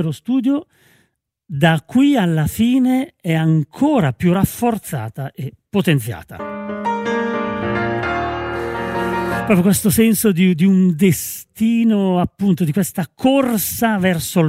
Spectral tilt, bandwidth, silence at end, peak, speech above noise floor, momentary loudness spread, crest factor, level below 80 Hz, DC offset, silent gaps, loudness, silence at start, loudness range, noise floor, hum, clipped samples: -6 dB/octave; 16 kHz; 0 s; 0 dBFS; 48 dB; 10 LU; 16 dB; -46 dBFS; under 0.1%; none; -17 LUFS; 0 s; 6 LU; -64 dBFS; none; under 0.1%